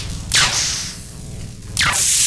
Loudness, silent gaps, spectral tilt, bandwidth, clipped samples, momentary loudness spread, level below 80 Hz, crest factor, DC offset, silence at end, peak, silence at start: -16 LUFS; none; -0.5 dB/octave; 11 kHz; under 0.1%; 19 LU; -34 dBFS; 18 dB; under 0.1%; 0 s; -2 dBFS; 0 s